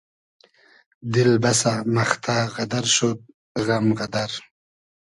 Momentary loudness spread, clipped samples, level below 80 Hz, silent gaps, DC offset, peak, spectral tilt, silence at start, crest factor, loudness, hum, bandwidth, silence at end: 13 LU; under 0.1%; -58 dBFS; 3.34-3.55 s; under 0.1%; -2 dBFS; -4 dB/octave; 1.05 s; 20 dB; -21 LUFS; none; 11.5 kHz; 0.7 s